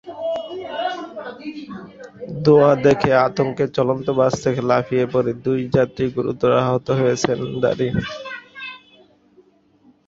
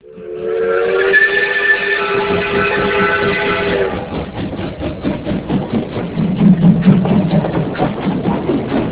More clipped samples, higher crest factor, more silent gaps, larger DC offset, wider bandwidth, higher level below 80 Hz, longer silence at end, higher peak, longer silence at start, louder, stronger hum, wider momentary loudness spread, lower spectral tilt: neither; about the same, 18 dB vs 14 dB; neither; neither; first, 7.8 kHz vs 4 kHz; second, -50 dBFS vs -36 dBFS; first, 1.3 s vs 0 s; about the same, -2 dBFS vs 0 dBFS; about the same, 0.05 s vs 0.05 s; second, -19 LUFS vs -15 LUFS; neither; first, 18 LU vs 12 LU; second, -6.5 dB/octave vs -10.5 dB/octave